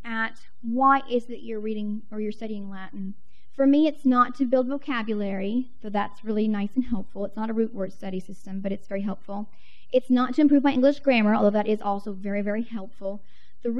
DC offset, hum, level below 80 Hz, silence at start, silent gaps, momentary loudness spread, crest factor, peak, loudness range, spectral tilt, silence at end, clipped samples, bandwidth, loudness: 3%; none; -58 dBFS; 0.05 s; none; 16 LU; 16 dB; -8 dBFS; 7 LU; -7.5 dB/octave; 0 s; under 0.1%; 7.6 kHz; -25 LUFS